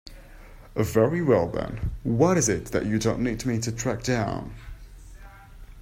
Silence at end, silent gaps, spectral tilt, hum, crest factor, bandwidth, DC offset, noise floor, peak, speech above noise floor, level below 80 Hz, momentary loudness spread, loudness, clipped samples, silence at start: 0 s; none; -5.5 dB/octave; none; 20 dB; 16 kHz; under 0.1%; -45 dBFS; -6 dBFS; 21 dB; -42 dBFS; 13 LU; -25 LUFS; under 0.1%; 0.05 s